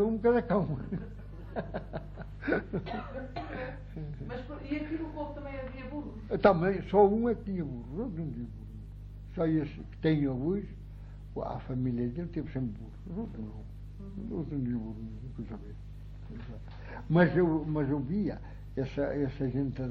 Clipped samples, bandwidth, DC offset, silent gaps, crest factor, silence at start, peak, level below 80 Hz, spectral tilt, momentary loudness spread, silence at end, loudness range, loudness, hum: under 0.1%; 6 kHz; under 0.1%; none; 22 dB; 0 s; -10 dBFS; -46 dBFS; -10 dB/octave; 19 LU; 0 s; 9 LU; -33 LUFS; 50 Hz at -45 dBFS